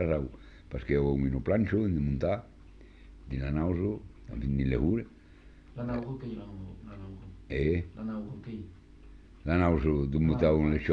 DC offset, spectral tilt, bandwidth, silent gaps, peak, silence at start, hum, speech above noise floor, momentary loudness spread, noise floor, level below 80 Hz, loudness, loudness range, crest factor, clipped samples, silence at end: under 0.1%; -10 dB/octave; 6.6 kHz; none; -12 dBFS; 0 s; none; 24 dB; 18 LU; -53 dBFS; -40 dBFS; -30 LUFS; 6 LU; 18 dB; under 0.1%; 0 s